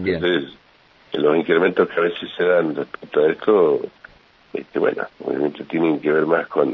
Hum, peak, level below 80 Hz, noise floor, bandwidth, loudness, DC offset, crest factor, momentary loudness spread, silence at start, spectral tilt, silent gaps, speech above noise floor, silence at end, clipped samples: none; -2 dBFS; -60 dBFS; -48 dBFS; 5.4 kHz; -20 LUFS; under 0.1%; 16 dB; 11 LU; 0 s; -8 dB/octave; none; 28 dB; 0 s; under 0.1%